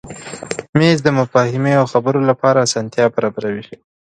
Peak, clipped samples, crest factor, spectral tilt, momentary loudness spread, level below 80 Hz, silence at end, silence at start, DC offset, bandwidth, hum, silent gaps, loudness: 0 dBFS; under 0.1%; 16 dB; -5.5 dB/octave; 13 LU; -54 dBFS; 0.4 s; 0.05 s; under 0.1%; 11 kHz; none; 0.69-0.73 s; -15 LUFS